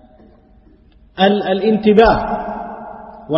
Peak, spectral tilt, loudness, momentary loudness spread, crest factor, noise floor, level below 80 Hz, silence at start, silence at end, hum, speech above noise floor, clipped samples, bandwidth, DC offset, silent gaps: 0 dBFS; -8.5 dB/octave; -14 LUFS; 23 LU; 16 dB; -48 dBFS; -38 dBFS; 1.15 s; 0 s; none; 35 dB; under 0.1%; 5.8 kHz; under 0.1%; none